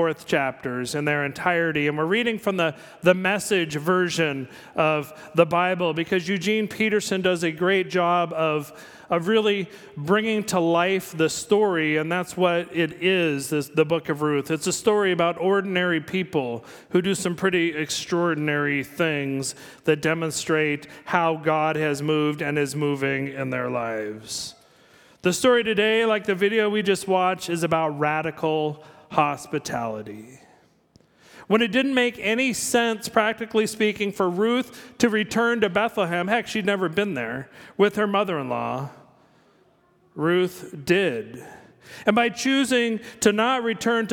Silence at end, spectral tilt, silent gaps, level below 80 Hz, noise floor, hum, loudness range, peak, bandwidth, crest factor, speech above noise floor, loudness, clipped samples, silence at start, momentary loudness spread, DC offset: 0 s; -4.5 dB/octave; none; -64 dBFS; -60 dBFS; none; 4 LU; -2 dBFS; 19 kHz; 20 dB; 37 dB; -23 LUFS; under 0.1%; 0 s; 8 LU; under 0.1%